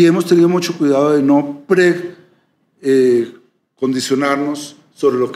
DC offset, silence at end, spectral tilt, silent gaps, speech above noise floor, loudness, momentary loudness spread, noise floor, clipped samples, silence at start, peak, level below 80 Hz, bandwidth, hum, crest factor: under 0.1%; 0 s; -6 dB/octave; none; 45 dB; -15 LUFS; 12 LU; -58 dBFS; under 0.1%; 0 s; -2 dBFS; -70 dBFS; 14 kHz; none; 14 dB